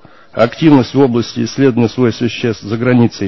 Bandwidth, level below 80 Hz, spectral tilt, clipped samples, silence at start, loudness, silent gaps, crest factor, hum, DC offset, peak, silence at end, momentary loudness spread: 6.2 kHz; -46 dBFS; -7 dB/octave; 0.1%; 0.35 s; -13 LUFS; none; 12 dB; none; 0.8%; 0 dBFS; 0 s; 8 LU